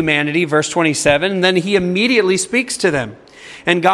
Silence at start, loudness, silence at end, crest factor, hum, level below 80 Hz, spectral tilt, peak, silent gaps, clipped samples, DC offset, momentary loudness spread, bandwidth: 0 s; -15 LUFS; 0 s; 16 dB; none; -50 dBFS; -4 dB/octave; 0 dBFS; none; under 0.1%; under 0.1%; 7 LU; 12 kHz